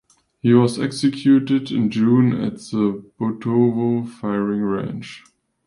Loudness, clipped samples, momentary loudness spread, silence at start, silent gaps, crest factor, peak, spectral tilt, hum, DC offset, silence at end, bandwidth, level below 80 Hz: -19 LUFS; under 0.1%; 10 LU; 0.45 s; none; 16 dB; -2 dBFS; -7.5 dB/octave; none; under 0.1%; 0.45 s; 11.5 kHz; -58 dBFS